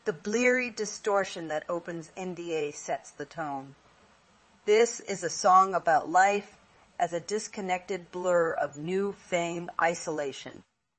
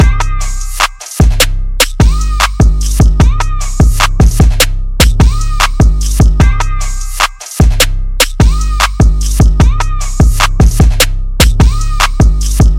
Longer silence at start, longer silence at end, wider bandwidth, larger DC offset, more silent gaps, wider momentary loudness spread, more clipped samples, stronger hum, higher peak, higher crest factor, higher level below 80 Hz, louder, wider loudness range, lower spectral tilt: about the same, 0.05 s vs 0 s; first, 0.4 s vs 0 s; second, 8.8 kHz vs 17.5 kHz; neither; neither; first, 14 LU vs 5 LU; second, under 0.1% vs 0.3%; neither; second, -10 dBFS vs 0 dBFS; first, 20 dB vs 8 dB; second, -74 dBFS vs -10 dBFS; second, -29 LUFS vs -11 LUFS; first, 8 LU vs 1 LU; about the same, -3.5 dB/octave vs -4.5 dB/octave